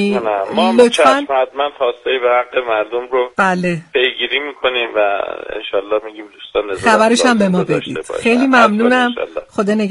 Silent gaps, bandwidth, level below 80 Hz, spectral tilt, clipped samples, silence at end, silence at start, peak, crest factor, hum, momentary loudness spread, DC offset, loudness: none; 11.5 kHz; -52 dBFS; -4.5 dB/octave; under 0.1%; 0 s; 0 s; 0 dBFS; 14 dB; none; 10 LU; under 0.1%; -15 LUFS